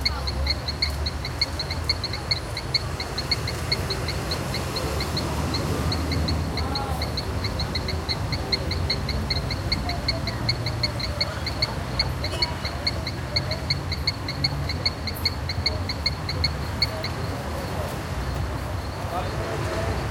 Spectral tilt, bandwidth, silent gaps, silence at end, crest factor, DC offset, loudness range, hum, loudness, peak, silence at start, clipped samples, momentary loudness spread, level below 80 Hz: -4.5 dB/octave; 16.5 kHz; none; 0 s; 20 dB; under 0.1%; 1 LU; none; -26 LUFS; -6 dBFS; 0 s; under 0.1%; 4 LU; -34 dBFS